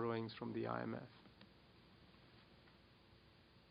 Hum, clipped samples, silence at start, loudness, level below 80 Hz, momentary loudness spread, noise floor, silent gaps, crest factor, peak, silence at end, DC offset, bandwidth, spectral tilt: none; under 0.1%; 0 s; -46 LUFS; -78 dBFS; 23 LU; -68 dBFS; none; 22 dB; -28 dBFS; 0 s; under 0.1%; 5.2 kHz; -5.5 dB/octave